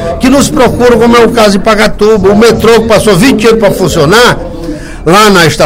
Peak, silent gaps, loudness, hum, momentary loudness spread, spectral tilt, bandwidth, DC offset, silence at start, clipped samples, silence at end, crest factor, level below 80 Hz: 0 dBFS; none; -5 LUFS; none; 4 LU; -4.5 dB/octave; 17.5 kHz; under 0.1%; 0 s; 8%; 0 s; 4 dB; -24 dBFS